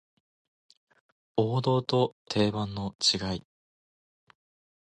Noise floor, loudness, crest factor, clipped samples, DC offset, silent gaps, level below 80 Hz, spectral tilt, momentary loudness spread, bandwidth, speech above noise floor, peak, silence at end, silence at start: under -90 dBFS; -28 LUFS; 20 dB; under 0.1%; under 0.1%; 2.12-2.26 s, 2.95-2.99 s; -58 dBFS; -5 dB/octave; 9 LU; 10.5 kHz; over 62 dB; -10 dBFS; 1.4 s; 1.35 s